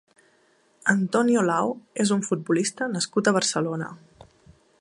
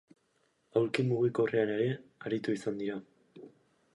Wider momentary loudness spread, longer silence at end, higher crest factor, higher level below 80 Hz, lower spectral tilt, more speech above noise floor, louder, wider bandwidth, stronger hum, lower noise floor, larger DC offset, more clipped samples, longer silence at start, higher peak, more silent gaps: about the same, 7 LU vs 9 LU; first, 0.85 s vs 0.45 s; about the same, 20 dB vs 22 dB; first, -68 dBFS vs -76 dBFS; second, -4.5 dB/octave vs -7 dB/octave; second, 39 dB vs 43 dB; first, -24 LUFS vs -32 LUFS; about the same, 11.5 kHz vs 11.5 kHz; neither; second, -63 dBFS vs -74 dBFS; neither; neither; about the same, 0.85 s vs 0.75 s; first, -4 dBFS vs -12 dBFS; neither